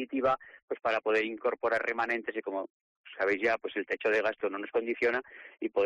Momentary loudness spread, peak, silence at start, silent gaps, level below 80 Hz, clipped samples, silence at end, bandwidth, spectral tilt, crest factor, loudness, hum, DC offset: 10 LU; -18 dBFS; 0 s; 0.62-0.68 s, 2.70-3.04 s; -70 dBFS; under 0.1%; 0 s; 9.2 kHz; -5 dB/octave; 12 dB; -31 LUFS; none; under 0.1%